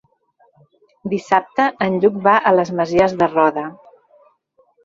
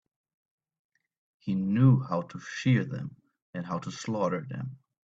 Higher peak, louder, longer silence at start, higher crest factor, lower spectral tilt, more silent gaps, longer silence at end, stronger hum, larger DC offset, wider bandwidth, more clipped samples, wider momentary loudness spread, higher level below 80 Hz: first, -2 dBFS vs -10 dBFS; first, -17 LUFS vs -29 LUFS; second, 1.05 s vs 1.45 s; about the same, 18 dB vs 20 dB; about the same, -6.5 dB/octave vs -7.5 dB/octave; second, none vs 3.42-3.53 s; first, 1.1 s vs 0.3 s; neither; neither; about the same, 7.6 kHz vs 7.8 kHz; neither; second, 11 LU vs 18 LU; first, -56 dBFS vs -68 dBFS